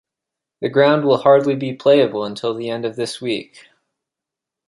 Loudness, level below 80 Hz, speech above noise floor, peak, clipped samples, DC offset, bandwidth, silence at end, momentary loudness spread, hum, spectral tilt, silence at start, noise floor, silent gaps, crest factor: -17 LUFS; -66 dBFS; 68 dB; -2 dBFS; under 0.1%; under 0.1%; 11.5 kHz; 1.25 s; 11 LU; none; -6 dB/octave; 0.6 s; -85 dBFS; none; 18 dB